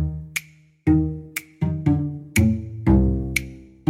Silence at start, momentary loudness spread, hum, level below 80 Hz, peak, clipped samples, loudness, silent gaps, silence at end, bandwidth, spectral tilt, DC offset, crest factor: 0 s; 11 LU; none; -30 dBFS; -4 dBFS; under 0.1%; -23 LUFS; none; 0 s; 16.5 kHz; -6.5 dB/octave; under 0.1%; 18 dB